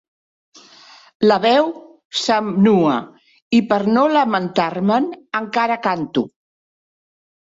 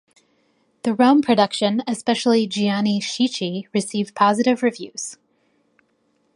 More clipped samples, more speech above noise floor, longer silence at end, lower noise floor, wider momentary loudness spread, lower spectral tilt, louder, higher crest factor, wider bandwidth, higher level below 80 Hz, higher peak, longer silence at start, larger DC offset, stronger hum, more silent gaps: neither; second, 29 dB vs 46 dB; about the same, 1.25 s vs 1.2 s; second, -46 dBFS vs -66 dBFS; about the same, 9 LU vs 11 LU; about the same, -5.5 dB/octave vs -4.5 dB/octave; first, -17 LUFS vs -20 LUFS; about the same, 16 dB vs 18 dB; second, 7.8 kHz vs 11.5 kHz; first, -62 dBFS vs -68 dBFS; about the same, -2 dBFS vs -2 dBFS; first, 1.2 s vs 0.85 s; neither; neither; first, 2.05-2.10 s, 3.42-3.51 s vs none